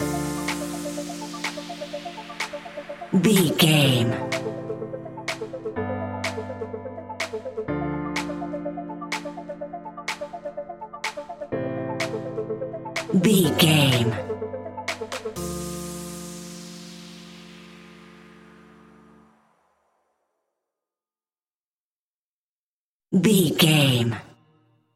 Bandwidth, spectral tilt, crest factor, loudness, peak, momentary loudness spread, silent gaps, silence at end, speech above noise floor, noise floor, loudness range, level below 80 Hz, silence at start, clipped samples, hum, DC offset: 16.5 kHz; -5 dB/octave; 24 dB; -25 LUFS; -2 dBFS; 19 LU; 21.56-23.00 s; 0.65 s; over 71 dB; under -90 dBFS; 13 LU; -54 dBFS; 0 s; under 0.1%; none; under 0.1%